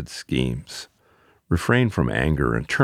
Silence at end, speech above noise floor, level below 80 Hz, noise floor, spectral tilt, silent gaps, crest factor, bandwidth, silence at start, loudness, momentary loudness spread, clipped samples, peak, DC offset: 0 s; 37 dB; -36 dBFS; -59 dBFS; -6 dB/octave; none; 20 dB; 14.5 kHz; 0 s; -23 LUFS; 16 LU; under 0.1%; -4 dBFS; under 0.1%